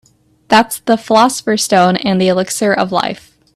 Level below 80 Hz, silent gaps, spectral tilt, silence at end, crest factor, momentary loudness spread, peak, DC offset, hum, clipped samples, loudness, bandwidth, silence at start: -54 dBFS; none; -4 dB/octave; 0.4 s; 14 dB; 5 LU; 0 dBFS; under 0.1%; none; under 0.1%; -13 LUFS; 14.5 kHz; 0.5 s